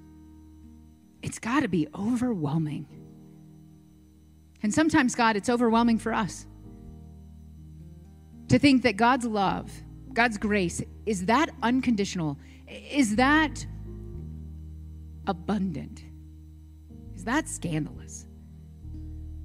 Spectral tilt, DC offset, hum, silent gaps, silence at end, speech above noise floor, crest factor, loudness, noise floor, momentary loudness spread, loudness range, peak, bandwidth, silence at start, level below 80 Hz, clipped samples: -5 dB/octave; under 0.1%; none; none; 0 s; 29 dB; 22 dB; -26 LUFS; -55 dBFS; 25 LU; 9 LU; -6 dBFS; 14.5 kHz; 0.05 s; -48 dBFS; under 0.1%